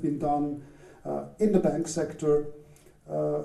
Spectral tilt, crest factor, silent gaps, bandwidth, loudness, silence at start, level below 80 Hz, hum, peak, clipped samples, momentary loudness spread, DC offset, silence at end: -7 dB/octave; 18 dB; none; 12.5 kHz; -28 LUFS; 0 s; -54 dBFS; none; -10 dBFS; under 0.1%; 13 LU; under 0.1%; 0 s